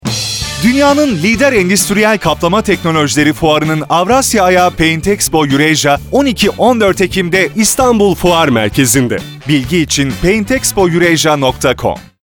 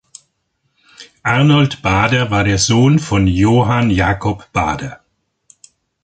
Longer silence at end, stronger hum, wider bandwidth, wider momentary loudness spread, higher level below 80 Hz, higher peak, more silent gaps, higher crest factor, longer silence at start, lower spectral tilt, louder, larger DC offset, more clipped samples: second, 0.2 s vs 1.1 s; neither; first, over 20 kHz vs 9.2 kHz; second, 4 LU vs 8 LU; about the same, -32 dBFS vs -34 dBFS; about the same, 0 dBFS vs 0 dBFS; neither; about the same, 10 dB vs 14 dB; second, 0.05 s vs 1 s; second, -4 dB/octave vs -5.5 dB/octave; first, -10 LUFS vs -14 LUFS; neither; first, 0.2% vs under 0.1%